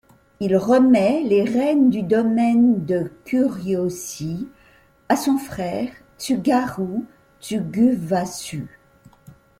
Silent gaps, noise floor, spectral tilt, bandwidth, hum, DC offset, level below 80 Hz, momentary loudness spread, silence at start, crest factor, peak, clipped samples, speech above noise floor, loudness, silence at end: none; -54 dBFS; -6 dB/octave; 15.5 kHz; none; under 0.1%; -56 dBFS; 14 LU; 0.4 s; 16 dB; -4 dBFS; under 0.1%; 35 dB; -20 LUFS; 0.9 s